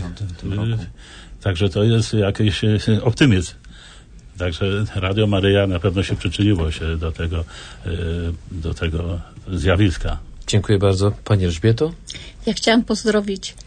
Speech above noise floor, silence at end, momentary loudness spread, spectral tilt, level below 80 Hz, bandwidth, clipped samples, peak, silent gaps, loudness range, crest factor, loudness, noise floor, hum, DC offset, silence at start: 23 dB; 0.05 s; 13 LU; -6 dB/octave; -34 dBFS; 9.6 kHz; under 0.1%; -2 dBFS; none; 4 LU; 18 dB; -20 LUFS; -42 dBFS; none; under 0.1%; 0 s